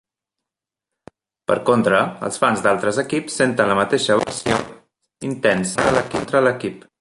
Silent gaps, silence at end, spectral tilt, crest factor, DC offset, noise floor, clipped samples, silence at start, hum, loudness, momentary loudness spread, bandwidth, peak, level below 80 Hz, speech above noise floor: none; 0.2 s; -4.5 dB/octave; 18 dB; under 0.1%; -86 dBFS; under 0.1%; 1.5 s; none; -19 LUFS; 9 LU; 11.5 kHz; -2 dBFS; -52 dBFS; 68 dB